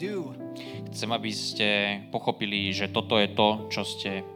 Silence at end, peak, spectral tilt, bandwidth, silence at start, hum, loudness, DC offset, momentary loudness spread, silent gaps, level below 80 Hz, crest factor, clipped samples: 0 s; -6 dBFS; -4 dB/octave; 16.5 kHz; 0 s; none; -27 LUFS; under 0.1%; 13 LU; none; -74 dBFS; 22 dB; under 0.1%